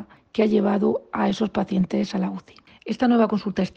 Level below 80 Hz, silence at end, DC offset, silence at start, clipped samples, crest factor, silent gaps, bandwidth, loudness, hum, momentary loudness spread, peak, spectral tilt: -56 dBFS; 0.05 s; under 0.1%; 0 s; under 0.1%; 14 dB; none; 7.8 kHz; -23 LUFS; none; 11 LU; -8 dBFS; -7.5 dB/octave